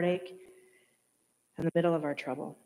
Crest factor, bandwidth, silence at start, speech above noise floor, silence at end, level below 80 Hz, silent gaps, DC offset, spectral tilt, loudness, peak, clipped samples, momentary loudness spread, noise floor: 18 dB; 13.5 kHz; 0 s; 42 dB; 0.1 s; -74 dBFS; none; under 0.1%; -7.5 dB/octave; -32 LUFS; -16 dBFS; under 0.1%; 22 LU; -74 dBFS